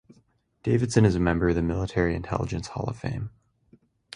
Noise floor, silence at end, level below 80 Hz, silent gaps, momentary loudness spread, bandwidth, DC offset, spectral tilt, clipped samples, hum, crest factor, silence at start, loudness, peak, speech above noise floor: -64 dBFS; 0.85 s; -40 dBFS; none; 12 LU; 10.5 kHz; under 0.1%; -7 dB/octave; under 0.1%; none; 20 dB; 0.65 s; -26 LUFS; -6 dBFS; 40 dB